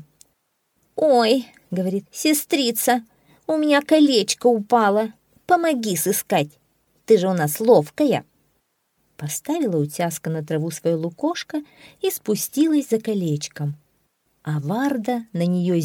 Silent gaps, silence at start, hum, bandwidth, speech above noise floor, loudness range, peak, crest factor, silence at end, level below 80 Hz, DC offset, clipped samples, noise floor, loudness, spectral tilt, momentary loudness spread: none; 0.95 s; none; 19.5 kHz; 50 dB; 6 LU; -2 dBFS; 20 dB; 0 s; -70 dBFS; under 0.1%; under 0.1%; -70 dBFS; -21 LUFS; -5 dB/octave; 12 LU